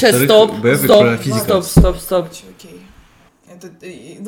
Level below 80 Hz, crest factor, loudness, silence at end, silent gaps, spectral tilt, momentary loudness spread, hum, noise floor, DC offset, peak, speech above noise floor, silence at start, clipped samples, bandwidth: -26 dBFS; 14 dB; -12 LUFS; 0 s; none; -5 dB/octave; 22 LU; none; -48 dBFS; under 0.1%; 0 dBFS; 35 dB; 0 s; under 0.1%; 19 kHz